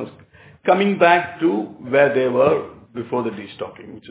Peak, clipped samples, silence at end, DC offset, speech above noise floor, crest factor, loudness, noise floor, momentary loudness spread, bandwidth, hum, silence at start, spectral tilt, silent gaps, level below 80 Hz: 0 dBFS; under 0.1%; 0 s; under 0.1%; 29 dB; 20 dB; -18 LUFS; -47 dBFS; 18 LU; 4 kHz; none; 0 s; -10 dB/octave; none; -58 dBFS